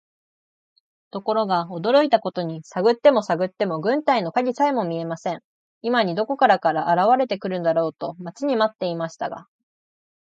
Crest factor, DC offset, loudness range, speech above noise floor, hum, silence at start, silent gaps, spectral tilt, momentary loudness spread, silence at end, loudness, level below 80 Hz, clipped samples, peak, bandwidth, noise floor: 18 dB; under 0.1%; 3 LU; over 69 dB; none; 1.15 s; 5.44-5.81 s; -6 dB/octave; 12 LU; 0.85 s; -22 LUFS; -74 dBFS; under 0.1%; -4 dBFS; 8 kHz; under -90 dBFS